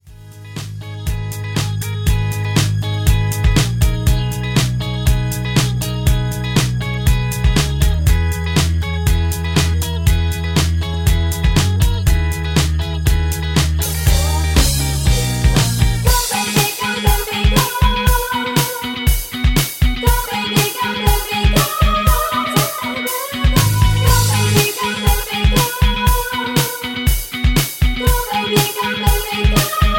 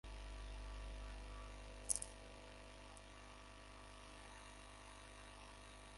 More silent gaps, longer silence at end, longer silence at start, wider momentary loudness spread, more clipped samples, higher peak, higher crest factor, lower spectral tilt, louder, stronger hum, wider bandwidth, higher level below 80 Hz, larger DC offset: neither; about the same, 0 s vs 0 s; about the same, 0.05 s vs 0.05 s; second, 4 LU vs 15 LU; neither; first, 0 dBFS vs -18 dBFS; second, 16 dB vs 34 dB; first, -4.5 dB/octave vs -2.5 dB/octave; first, -16 LUFS vs -52 LUFS; second, none vs 50 Hz at -60 dBFS; first, 17 kHz vs 11.5 kHz; first, -20 dBFS vs -56 dBFS; neither